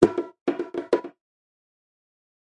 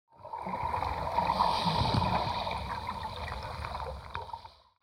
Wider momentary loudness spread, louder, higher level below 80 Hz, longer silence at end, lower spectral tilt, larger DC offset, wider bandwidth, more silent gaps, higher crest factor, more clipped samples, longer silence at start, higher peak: second, 8 LU vs 13 LU; first, -27 LUFS vs -33 LUFS; second, -58 dBFS vs -46 dBFS; first, 1.4 s vs 0.3 s; first, -7 dB/octave vs -5.5 dB/octave; neither; second, 10.5 kHz vs 16.5 kHz; first, 0.41-0.46 s vs none; first, 26 dB vs 18 dB; neither; second, 0 s vs 0.2 s; first, -2 dBFS vs -14 dBFS